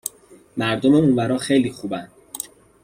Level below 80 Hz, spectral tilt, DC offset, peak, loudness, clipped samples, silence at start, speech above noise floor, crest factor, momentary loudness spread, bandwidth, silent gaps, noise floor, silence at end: -56 dBFS; -5.5 dB/octave; under 0.1%; -4 dBFS; -19 LUFS; under 0.1%; 0.05 s; 30 dB; 16 dB; 17 LU; 16 kHz; none; -49 dBFS; 0.4 s